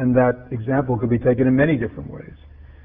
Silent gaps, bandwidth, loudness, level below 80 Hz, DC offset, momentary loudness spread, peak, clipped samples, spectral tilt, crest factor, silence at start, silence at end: none; 3.7 kHz; -20 LUFS; -44 dBFS; under 0.1%; 17 LU; -4 dBFS; under 0.1%; -12.5 dB/octave; 16 dB; 0 s; 0.05 s